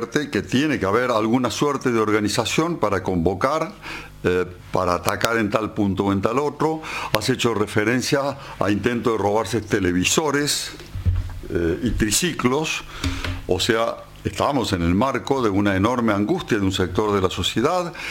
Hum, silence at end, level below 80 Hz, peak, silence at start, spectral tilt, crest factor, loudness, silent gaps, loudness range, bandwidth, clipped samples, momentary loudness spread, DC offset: none; 0 s; -38 dBFS; 0 dBFS; 0 s; -4.5 dB/octave; 22 dB; -21 LUFS; none; 2 LU; 17 kHz; under 0.1%; 6 LU; under 0.1%